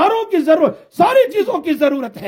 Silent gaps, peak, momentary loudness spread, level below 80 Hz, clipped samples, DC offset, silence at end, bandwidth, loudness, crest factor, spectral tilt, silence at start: none; 0 dBFS; 6 LU; -62 dBFS; under 0.1%; under 0.1%; 0 s; 16.5 kHz; -15 LUFS; 14 dB; -5.5 dB/octave; 0 s